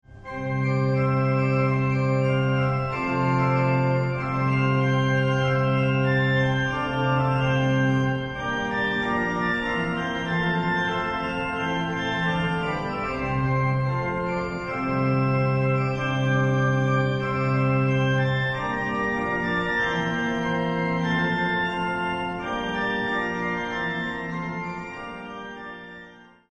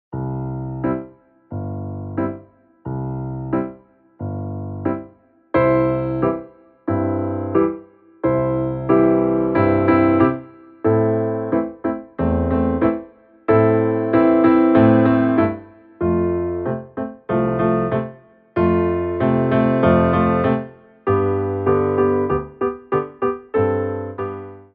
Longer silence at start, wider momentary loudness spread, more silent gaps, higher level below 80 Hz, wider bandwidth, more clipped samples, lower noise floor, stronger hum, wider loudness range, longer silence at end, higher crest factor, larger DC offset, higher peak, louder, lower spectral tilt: about the same, 0.1 s vs 0.1 s; second, 7 LU vs 14 LU; neither; about the same, -46 dBFS vs -42 dBFS; first, 7.4 kHz vs 4.3 kHz; neither; about the same, -47 dBFS vs -48 dBFS; neither; second, 3 LU vs 11 LU; first, 0.35 s vs 0.1 s; about the same, 14 dB vs 16 dB; neither; second, -10 dBFS vs -2 dBFS; second, -24 LUFS vs -19 LUFS; second, -7 dB/octave vs -12.5 dB/octave